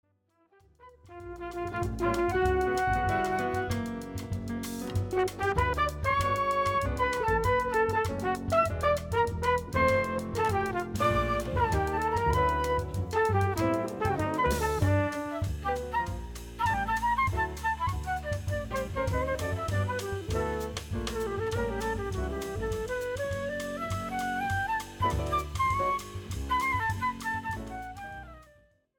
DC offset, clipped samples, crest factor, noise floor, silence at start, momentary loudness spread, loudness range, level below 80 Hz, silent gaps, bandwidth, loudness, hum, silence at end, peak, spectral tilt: under 0.1%; under 0.1%; 16 dB; -70 dBFS; 0.8 s; 8 LU; 5 LU; -42 dBFS; none; 19 kHz; -30 LUFS; none; 0.55 s; -14 dBFS; -5.5 dB/octave